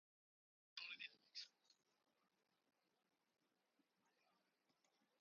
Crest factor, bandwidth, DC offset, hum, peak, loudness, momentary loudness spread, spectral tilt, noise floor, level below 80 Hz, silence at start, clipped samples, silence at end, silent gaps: 28 dB; 7 kHz; under 0.1%; none; -38 dBFS; -56 LUFS; 7 LU; 4 dB/octave; -87 dBFS; under -90 dBFS; 0.75 s; under 0.1%; 3.45 s; none